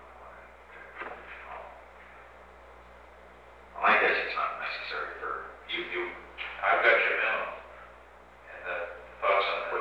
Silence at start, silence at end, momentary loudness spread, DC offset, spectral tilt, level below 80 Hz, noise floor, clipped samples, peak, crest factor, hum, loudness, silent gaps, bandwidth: 0 s; 0 s; 26 LU; under 0.1%; -4 dB/octave; -60 dBFS; -53 dBFS; under 0.1%; -10 dBFS; 22 dB; 60 Hz at -60 dBFS; -28 LUFS; none; 9.6 kHz